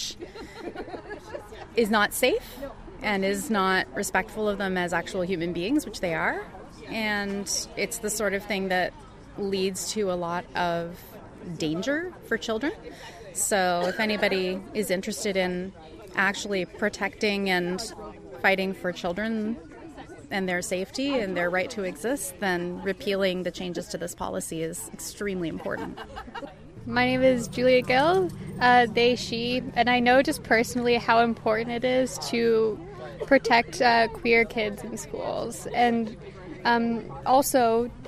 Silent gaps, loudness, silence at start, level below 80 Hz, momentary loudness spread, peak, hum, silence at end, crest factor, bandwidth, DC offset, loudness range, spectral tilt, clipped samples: none; -26 LUFS; 0 s; -52 dBFS; 17 LU; -6 dBFS; none; 0 s; 20 dB; 15.5 kHz; under 0.1%; 7 LU; -4 dB/octave; under 0.1%